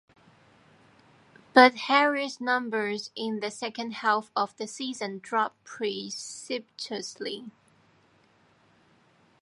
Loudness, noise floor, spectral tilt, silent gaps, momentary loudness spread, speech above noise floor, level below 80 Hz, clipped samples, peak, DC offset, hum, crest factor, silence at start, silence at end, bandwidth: -27 LUFS; -63 dBFS; -3 dB/octave; none; 16 LU; 36 dB; -82 dBFS; under 0.1%; -4 dBFS; under 0.1%; none; 26 dB; 1.55 s; 1.9 s; 11.5 kHz